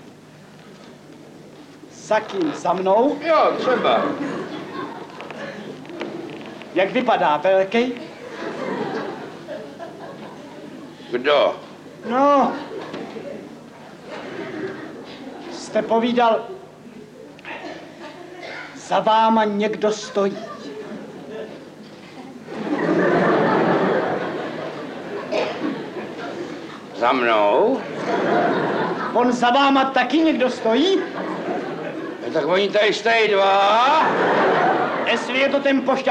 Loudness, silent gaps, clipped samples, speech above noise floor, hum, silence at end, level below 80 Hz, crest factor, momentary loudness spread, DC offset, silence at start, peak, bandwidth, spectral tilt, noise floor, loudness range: -20 LUFS; none; under 0.1%; 26 dB; none; 0 s; -66 dBFS; 18 dB; 20 LU; under 0.1%; 0 s; -2 dBFS; 10.5 kHz; -5 dB/octave; -44 dBFS; 8 LU